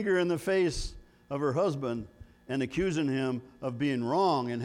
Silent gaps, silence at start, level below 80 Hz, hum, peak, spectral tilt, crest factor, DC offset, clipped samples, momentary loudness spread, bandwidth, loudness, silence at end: none; 0 s; -48 dBFS; none; -16 dBFS; -6 dB/octave; 14 dB; under 0.1%; under 0.1%; 11 LU; 15.5 kHz; -30 LUFS; 0 s